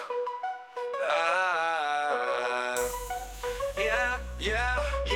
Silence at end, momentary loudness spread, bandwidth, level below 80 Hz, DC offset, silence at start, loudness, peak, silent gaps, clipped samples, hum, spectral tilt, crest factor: 0 s; 10 LU; 18 kHz; -42 dBFS; under 0.1%; 0 s; -29 LUFS; -14 dBFS; none; under 0.1%; none; -3 dB/octave; 16 dB